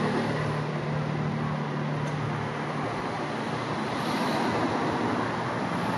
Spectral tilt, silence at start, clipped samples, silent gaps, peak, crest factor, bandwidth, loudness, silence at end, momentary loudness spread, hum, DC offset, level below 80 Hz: -6.5 dB/octave; 0 s; under 0.1%; none; -14 dBFS; 14 dB; 12.5 kHz; -29 LUFS; 0 s; 4 LU; none; under 0.1%; -58 dBFS